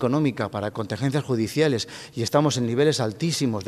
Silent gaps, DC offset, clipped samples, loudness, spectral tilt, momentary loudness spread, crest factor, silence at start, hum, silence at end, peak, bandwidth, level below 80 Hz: none; under 0.1%; under 0.1%; -24 LUFS; -5.5 dB/octave; 8 LU; 18 dB; 0 s; none; 0 s; -6 dBFS; 14.5 kHz; -60 dBFS